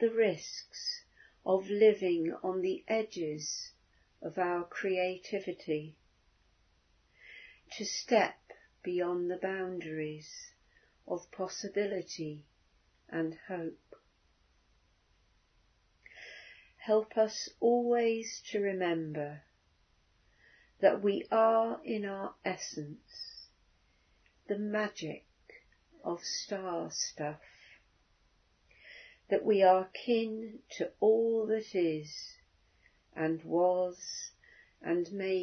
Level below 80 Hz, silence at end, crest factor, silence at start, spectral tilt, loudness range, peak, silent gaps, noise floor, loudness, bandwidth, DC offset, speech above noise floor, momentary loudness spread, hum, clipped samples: -74 dBFS; 0 s; 22 dB; 0 s; -3.5 dB/octave; 9 LU; -12 dBFS; none; -71 dBFS; -33 LUFS; 6.4 kHz; under 0.1%; 38 dB; 19 LU; none; under 0.1%